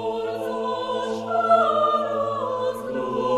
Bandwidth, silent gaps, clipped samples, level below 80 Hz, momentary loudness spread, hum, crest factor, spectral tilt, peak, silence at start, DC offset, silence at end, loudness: 14 kHz; none; under 0.1%; -60 dBFS; 9 LU; none; 18 dB; -5.5 dB/octave; -6 dBFS; 0 s; under 0.1%; 0 s; -23 LUFS